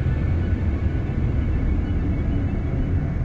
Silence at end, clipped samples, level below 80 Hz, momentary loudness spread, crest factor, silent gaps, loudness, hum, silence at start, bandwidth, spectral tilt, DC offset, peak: 0 s; under 0.1%; -26 dBFS; 1 LU; 10 dB; none; -24 LUFS; none; 0 s; 4.8 kHz; -10 dB/octave; under 0.1%; -10 dBFS